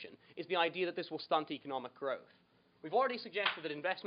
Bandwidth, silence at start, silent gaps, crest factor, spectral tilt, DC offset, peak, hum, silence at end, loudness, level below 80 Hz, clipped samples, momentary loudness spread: 5.2 kHz; 0 s; none; 20 dB; -1 dB/octave; under 0.1%; -18 dBFS; none; 0.05 s; -37 LUFS; under -90 dBFS; under 0.1%; 10 LU